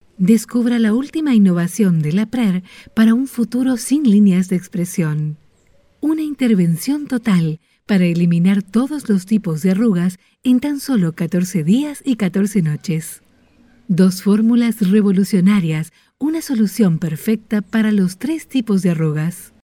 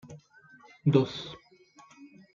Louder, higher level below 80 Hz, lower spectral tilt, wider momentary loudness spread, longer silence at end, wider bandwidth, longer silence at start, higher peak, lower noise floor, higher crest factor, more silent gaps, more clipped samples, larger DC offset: first, -17 LUFS vs -28 LUFS; first, -56 dBFS vs -70 dBFS; about the same, -7 dB/octave vs -8 dB/octave; second, 8 LU vs 26 LU; about the same, 0.2 s vs 0.3 s; first, 16 kHz vs 7.4 kHz; first, 0.2 s vs 0.05 s; first, -2 dBFS vs -8 dBFS; second, -54 dBFS vs -58 dBFS; second, 14 dB vs 24 dB; neither; neither; neither